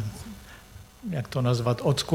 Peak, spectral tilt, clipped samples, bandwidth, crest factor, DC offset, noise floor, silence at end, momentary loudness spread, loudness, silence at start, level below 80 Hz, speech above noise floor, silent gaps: -10 dBFS; -6 dB/octave; under 0.1%; 16 kHz; 18 dB; under 0.1%; -48 dBFS; 0 s; 22 LU; -27 LUFS; 0 s; -52 dBFS; 23 dB; none